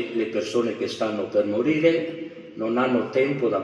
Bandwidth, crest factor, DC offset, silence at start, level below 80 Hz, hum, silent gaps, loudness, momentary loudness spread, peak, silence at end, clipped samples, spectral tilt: 11 kHz; 18 dB; under 0.1%; 0 s; -72 dBFS; none; none; -24 LUFS; 10 LU; -6 dBFS; 0 s; under 0.1%; -6 dB/octave